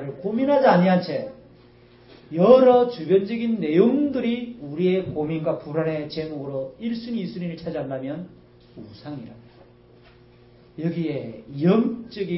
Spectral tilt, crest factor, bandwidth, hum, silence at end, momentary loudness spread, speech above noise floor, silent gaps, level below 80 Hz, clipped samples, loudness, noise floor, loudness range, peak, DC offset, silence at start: -11.5 dB/octave; 20 dB; 5.8 kHz; none; 0 s; 19 LU; 30 dB; none; -60 dBFS; under 0.1%; -22 LUFS; -51 dBFS; 15 LU; -2 dBFS; under 0.1%; 0 s